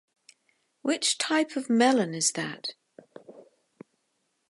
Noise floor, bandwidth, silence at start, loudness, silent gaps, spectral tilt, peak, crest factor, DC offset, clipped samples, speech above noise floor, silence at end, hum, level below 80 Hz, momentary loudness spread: -76 dBFS; 11.5 kHz; 0.85 s; -26 LUFS; none; -2.5 dB/octave; -8 dBFS; 20 dB; under 0.1%; under 0.1%; 50 dB; 1.1 s; none; -82 dBFS; 12 LU